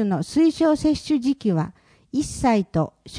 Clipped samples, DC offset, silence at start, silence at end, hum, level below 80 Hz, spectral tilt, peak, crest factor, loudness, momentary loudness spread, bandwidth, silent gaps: under 0.1%; under 0.1%; 0 s; 0 s; none; -46 dBFS; -6.5 dB/octave; -8 dBFS; 14 dB; -22 LUFS; 8 LU; 10.5 kHz; none